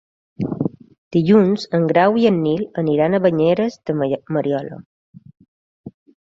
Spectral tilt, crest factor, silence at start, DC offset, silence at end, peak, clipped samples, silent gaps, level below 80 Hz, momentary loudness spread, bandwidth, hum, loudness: -8 dB/octave; 16 dB; 0.4 s; under 0.1%; 0.45 s; -2 dBFS; under 0.1%; 0.98-1.11 s, 4.86-5.13 s, 5.48-5.84 s; -58 dBFS; 12 LU; 7.6 kHz; none; -18 LUFS